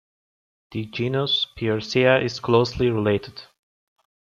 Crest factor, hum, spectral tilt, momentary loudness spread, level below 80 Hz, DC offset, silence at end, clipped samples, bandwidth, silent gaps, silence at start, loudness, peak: 20 dB; none; -6 dB/octave; 15 LU; -50 dBFS; under 0.1%; 0.8 s; under 0.1%; 7.4 kHz; none; 0.7 s; -22 LUFS; -4 dBFS